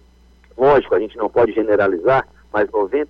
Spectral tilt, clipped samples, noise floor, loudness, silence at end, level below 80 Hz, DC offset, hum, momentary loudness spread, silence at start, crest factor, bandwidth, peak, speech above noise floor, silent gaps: -8 dB/octave; under 0.1%; -50 dBFS; -17 LUFS; 0.05 s; -48 dBFS; under 0.1%; 60 Hz at -50 dBFS; 6 LU; 0.6 s; 12 dB; 5.8 kHz; -6 dBFS; 33 dB; none